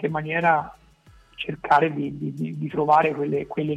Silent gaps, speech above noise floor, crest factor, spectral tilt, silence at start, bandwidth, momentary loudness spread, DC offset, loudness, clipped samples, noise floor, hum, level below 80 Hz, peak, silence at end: none; 31 dB; 16 dB; -7.5 dB/octave; 0 s; 9.6 kHz; 12 LU; under 0.1%; -23 LUFS; under 0.1%; -53 dBFS; none; -58 dBFS; -6 dBFS; 0 s